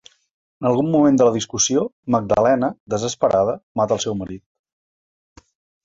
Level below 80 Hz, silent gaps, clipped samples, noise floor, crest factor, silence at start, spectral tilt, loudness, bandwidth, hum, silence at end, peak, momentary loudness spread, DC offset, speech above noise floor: -52 dBFS; 1.93-2.03 s, 2.80-2.86 s, 3.63-3.75 s; under 0.1%; under -90 dBFS; 18 dB; 0.6 s; -4.5 dB/octave; -19 LUFS; 7.8 kHz; none; 1.45 s; -4 dBFS; 9 LU; under 0.1%; over 72 dB